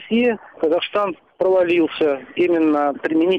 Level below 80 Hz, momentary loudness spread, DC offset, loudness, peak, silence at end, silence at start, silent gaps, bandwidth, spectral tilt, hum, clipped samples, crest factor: -62 dBFS; 6 LU; under 0.1%; -19 LUFS; -8 dBFS; 0 s; 0 s; none; 5.2 kHz; -7 dB/octave; none; under 0.1%; 10 dB